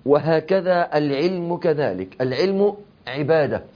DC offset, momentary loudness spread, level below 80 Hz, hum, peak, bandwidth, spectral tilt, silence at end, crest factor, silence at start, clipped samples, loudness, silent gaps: under 0.1%; 7 LU; -60 dBFS; none; -4 dBFS; 5.2 kHz; -8 dB/octave; 0.1 s; 16 dB; 0.05 s; under 0.1%; -21 LUFS; none